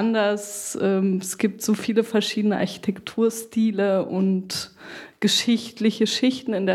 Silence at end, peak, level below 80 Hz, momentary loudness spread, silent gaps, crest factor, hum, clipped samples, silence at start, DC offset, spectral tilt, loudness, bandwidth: 0 s; -8 dBFS; -68 dBFS; 8 LU; none; 16 dB; none; under 0.1%; 0 s; under 0.1%; -4.5 dB/octave; -23 LUFS; 15.5 kHz